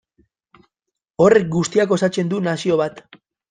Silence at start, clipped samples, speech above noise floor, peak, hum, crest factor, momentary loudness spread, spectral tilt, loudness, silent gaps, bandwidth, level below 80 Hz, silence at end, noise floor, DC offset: 1.2 s; under 0.1%; 65 dB; -2 dBFS; none; 18 dB; 7 LU; -6 dB/octave; -18 LUFS; none; 9.6 kHz; -58 dBFS; 0.5 s; -82 dBFS; under 0.1%